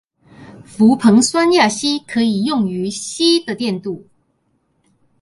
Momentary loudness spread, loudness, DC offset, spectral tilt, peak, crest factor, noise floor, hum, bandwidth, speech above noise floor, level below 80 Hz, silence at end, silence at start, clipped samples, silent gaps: 12 LU; -15 LUFS; under 0.1%; -4 dB/octave; 0 dBFS; 16 dB; -64 dBFS; none; 11.5 kHz; 49 dB; -60 dBFS; 1.25 s; 0.4 s; under 0.1%; none